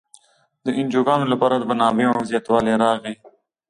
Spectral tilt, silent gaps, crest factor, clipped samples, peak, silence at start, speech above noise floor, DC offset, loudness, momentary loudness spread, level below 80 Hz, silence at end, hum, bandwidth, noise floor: -6 dB/octave; none; 18 dB; under 0.1%; -2 dBFS; 0.65 s; 40 dB; under 0.1%; -19 LUFS; 9 LU; -58 dBFS; 0.4 s; none; 11 kHz; -59 dBFS